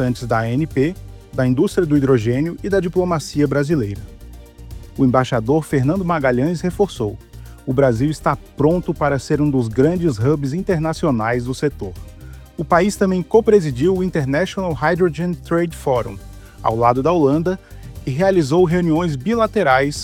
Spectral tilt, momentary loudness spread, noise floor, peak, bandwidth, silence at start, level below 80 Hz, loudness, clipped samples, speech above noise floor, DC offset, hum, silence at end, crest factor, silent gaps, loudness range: -7 dB/octave; 13 LU; -37 dBFS; -2 dBFS; 16.5 kHz; 0 s; -38 dBFS; -18 LUFS; under 0.1%; 20 dB; under 0.1%; none; 0 s; 16 dB; none; 2 LU